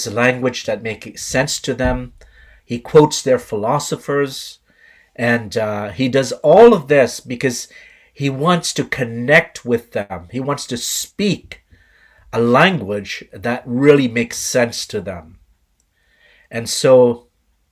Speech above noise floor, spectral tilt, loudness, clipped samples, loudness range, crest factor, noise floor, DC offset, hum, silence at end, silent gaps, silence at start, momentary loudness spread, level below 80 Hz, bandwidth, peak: 46 dB; -4.5 dB/octave; -16 LUFS; under 0.1%; 4 LU; 18 dB; -62 dBFS; under 0.1%; none; 0.55 s; none; 0 s; 15 LU; -42 dBFS; 16 kHz; 0 dBFS